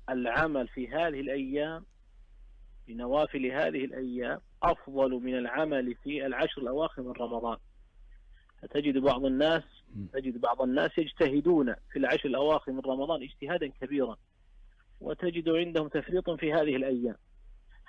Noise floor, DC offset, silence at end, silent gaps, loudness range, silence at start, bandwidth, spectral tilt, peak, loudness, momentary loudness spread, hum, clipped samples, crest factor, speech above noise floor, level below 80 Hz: -57 dBFS; under 0.1%; 0.05 s; none; 5 LU; 0 s; 7.2 kHz; -7 dB/octave; -16 dBFS; -31 LUFS; 9 LU; none; under 0.1%; 16 dB; 27 dB; -52 dBFS